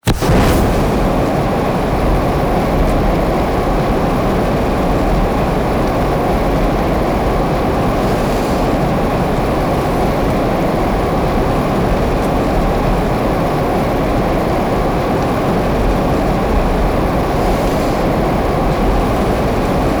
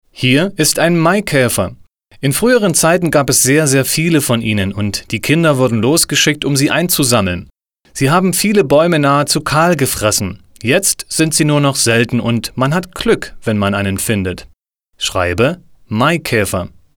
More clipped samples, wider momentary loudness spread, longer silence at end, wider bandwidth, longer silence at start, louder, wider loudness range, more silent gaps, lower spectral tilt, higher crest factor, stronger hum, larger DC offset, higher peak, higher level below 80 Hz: neither; second, 1 LU vs 8 LU; second, 0 s vs 0.3 s; about the same, over 20 kHz vs over 20 kHz; about the same, 0.05 s vs 0.15 s; about the same, -15 LUFS vs -13 LUFS; second, 0 LU vs 4 LU; neither; first, -7 dB/octave vs -4 dB/octave; second, 8 dB vs 14 dB; neither; neither; second, -6 dBFS vs 0 dBFS; first, -20 dBFS vs -42 dBFS